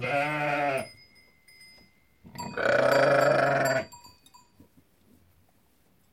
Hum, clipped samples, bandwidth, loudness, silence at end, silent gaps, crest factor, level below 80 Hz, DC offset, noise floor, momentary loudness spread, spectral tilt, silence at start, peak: none; under 0.1%; 16.5 kHz; -25 LUFS; 2.05 s; none; 18 dB; -68 dBFS; under 0.1%; -66 dBFS; 20 LU; -5 dB/octave; 0 s; -10 dBFS